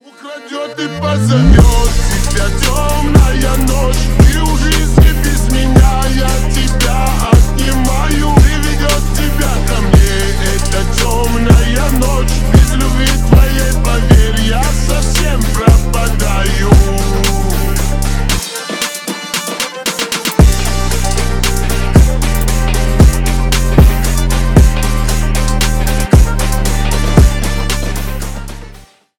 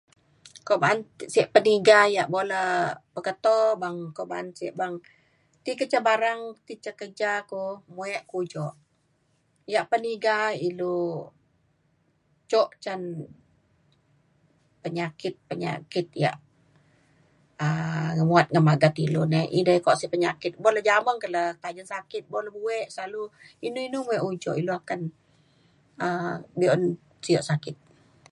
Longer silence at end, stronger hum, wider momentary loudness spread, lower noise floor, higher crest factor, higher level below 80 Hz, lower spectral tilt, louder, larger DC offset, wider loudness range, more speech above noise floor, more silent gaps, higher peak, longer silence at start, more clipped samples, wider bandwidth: about the same, 0.5 s vs 0.6 s; neither; second, 7 LU vs 16 LU; second, -37 dBFS vs -69 dBFS; second, 10 dB vs 24 dB; first, -12 dBFS vs -70 dBFS; about the same, -5 dB/octave vs -6 dB/octave; first, -12 LUFS vs -25 LUFS; neither; second, 3 LU vs 10 LU; second, 27 dB vs 44 dB; neither; about the same, 0 dBFS vs -2 dBFS; second, 0.25 s vs 0.45 s; first, 1% vs under 0.1%; first, 19 kHz vs 11.5 kHz